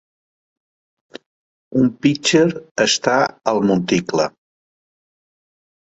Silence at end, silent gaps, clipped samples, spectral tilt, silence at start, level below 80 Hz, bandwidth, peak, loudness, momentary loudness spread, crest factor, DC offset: 1.65 s; 1.26-1.71 s, 2.71-2.75 s; under 0.1%; -4.5 dB/octave; 1.15 s; -58 dBFS; 8.2 kHz; -2 dBFS; -17 LUFS; 6 LU; 20 dB; under 0.1%